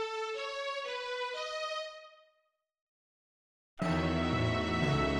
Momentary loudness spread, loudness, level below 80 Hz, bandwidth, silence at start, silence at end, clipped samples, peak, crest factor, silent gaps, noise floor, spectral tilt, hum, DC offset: 7 LU; -34 LUFS; -50 dBFS; 10.5 kHz; 0 s; 0 s; under 0.1%; -18 dBFS; 18 dB; 2.81-3.77 s; -78 dBFS; -6 dB/octave; none; under 0.1%